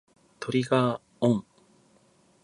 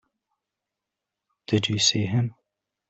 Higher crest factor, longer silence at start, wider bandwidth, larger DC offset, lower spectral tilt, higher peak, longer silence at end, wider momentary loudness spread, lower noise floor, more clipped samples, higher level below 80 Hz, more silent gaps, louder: about the same, 20 dB vs 22 dB; second, 0.4 s vs 1.5 s; first, 11 kHz vs 8.2 kHz; neither; first, -7 dB/octave vs -4 dB/octave; about the same, -8 dBFS vs -6 dBFS; first, 1 s vs 0.6 s; about the same, 6 LU vs 7 LU; second, -62 dBFS vs -86 dBFS; neither; second, -68 dBFS vs -62 dBFS; neither; second, -27 LUFS vs -23 LUFS